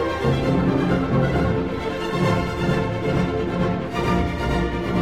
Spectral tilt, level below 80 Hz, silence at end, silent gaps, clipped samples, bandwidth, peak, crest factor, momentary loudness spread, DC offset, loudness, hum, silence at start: -7.5 dB/octave; -34 dBFS; 0 s; none; under 0.1%; 13.5 kHz; -8 dBFS; 12 dB; 4 LU; 0.5%; -22 LUFS; none; 0 s